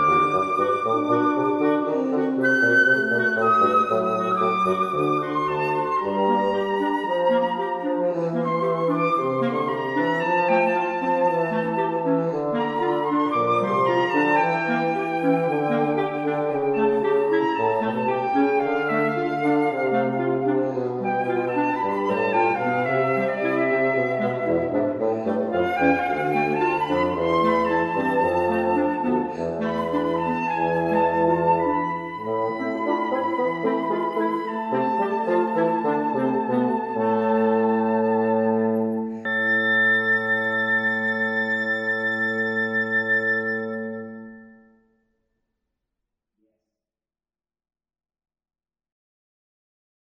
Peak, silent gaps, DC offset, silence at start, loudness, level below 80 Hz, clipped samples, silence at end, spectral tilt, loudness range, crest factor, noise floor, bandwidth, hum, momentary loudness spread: -6 dBFS; none; under 0.1%; 0 s; -22 LUFS; -62 dBFS; under 0.1%; 5.7 s; -7 dB/octave; 3 LU; 16 dB; under -90 dBFS; 12 kHz; none; 5 LU